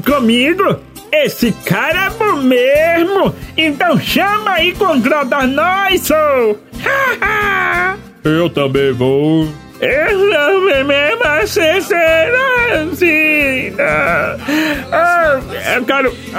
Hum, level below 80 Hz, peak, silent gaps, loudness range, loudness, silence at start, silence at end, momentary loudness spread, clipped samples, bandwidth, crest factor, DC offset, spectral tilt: none; -38 dBFS; 0 dBFS; none; 2 LU; -12 LUFS; 0 s; 0 s; 5 LU; under 0.1%; 16.5 kHz; 12 dB; under 0.1%; -4.5 dB/octave